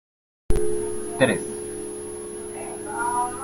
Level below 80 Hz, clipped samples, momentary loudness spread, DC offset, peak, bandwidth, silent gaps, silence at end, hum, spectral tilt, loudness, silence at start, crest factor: -36 dBFS; under 0.1%; 12 LU; under 0.1%; -4 dBFS; 16.5 kHz; none; 0 s; none; -4 dB/octave; -27 LUFS; 0.5 s; 22 dB